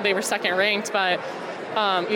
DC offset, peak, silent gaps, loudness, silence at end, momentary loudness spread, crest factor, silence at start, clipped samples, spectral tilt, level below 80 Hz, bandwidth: under 0.1%; -8 dBFS; none; -23 LUFS; 0 s; 9 LU; 16 dB; 0 s; under 0.1%; -2.5 dB/octave; -78 dBFS; 18 kHz